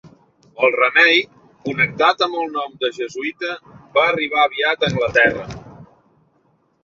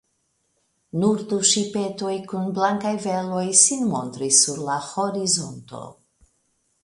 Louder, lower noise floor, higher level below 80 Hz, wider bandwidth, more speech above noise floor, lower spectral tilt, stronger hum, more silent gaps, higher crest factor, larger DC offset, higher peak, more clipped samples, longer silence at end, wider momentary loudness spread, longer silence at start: first, -17 LUFS vs -21 LUFS; second, -61 dBFS vs -71 dBFS; first, -52 dBFS vs -66 dBFS; second, 7.6 kHz vs 11.5 kHz; second, 44 dB vs 48 dB; first, -4.5 dB/octave vs -3 dB/octave; neither; neither; second, 18 dB vs 24 dB; neither; about the same, -2 dBFS vs 0 dBFS; neither; about the same, 1 s vs 0.9 s; first, 16 LU vs 13 LU; second, 0.05 s vs 0.95 s